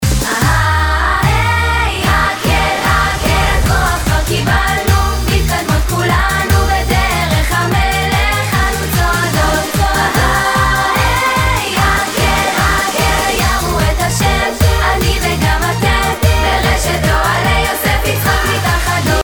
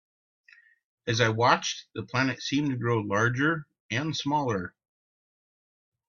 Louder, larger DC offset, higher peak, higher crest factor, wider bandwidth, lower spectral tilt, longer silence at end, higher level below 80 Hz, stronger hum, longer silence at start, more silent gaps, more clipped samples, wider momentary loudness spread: first, -13 LUFS vs -27 LUFS; neither; first, 0 dBFS vs -4 dBFS; second, 12 dB vs 24 dB; first, over 20 kHz vs 7.4 kHz; about the same, -4 dB/octave vs -5 dB/octave; second, 0 s vs 1.4 s; first, -18 dBFS vs -64 dBFS; neither; second, 0 s vs 1.05 s; second, none vs 3.80-3.89 s; neither; second, 2 LU vs 10 LU